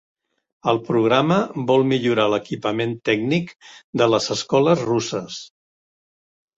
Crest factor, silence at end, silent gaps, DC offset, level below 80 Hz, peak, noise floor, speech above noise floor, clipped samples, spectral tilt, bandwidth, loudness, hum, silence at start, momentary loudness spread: 18 dB; 1.1 s; 3.84-3.93 s; under 0.1%; -60 dBFS; -4 dBFS; under -90 dBFS; over 70 dB; under 0.1%; -5.5 dB/octave; 7.8 kHz; -20 LUFS; none; 0.65 s; 10 LU